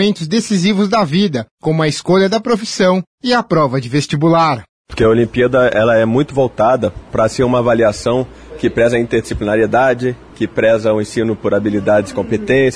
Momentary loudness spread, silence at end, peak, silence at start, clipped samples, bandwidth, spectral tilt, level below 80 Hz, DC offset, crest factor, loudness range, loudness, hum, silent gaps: 7 LU; 0 s; -2 dBFS; 0 s; under 0.1%; 11 kHz; -6 dB/octave; -40 dBFS; under 0.1%; 10 dB; 2 LU; -14 LUFS; none; 1.51-1.57 s, 3.07-3.18 s, 4.69-4.84 s